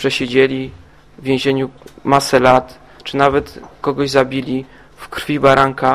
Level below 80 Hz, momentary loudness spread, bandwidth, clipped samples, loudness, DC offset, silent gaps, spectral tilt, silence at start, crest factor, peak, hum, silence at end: -44 dBFS; 16 LU; 15.5 kHz; under 0.1%; -16 LUFS; 0.3%; none; -5 dB/octave; 0 s; 16 dB; 0 dBFS; none; 0 s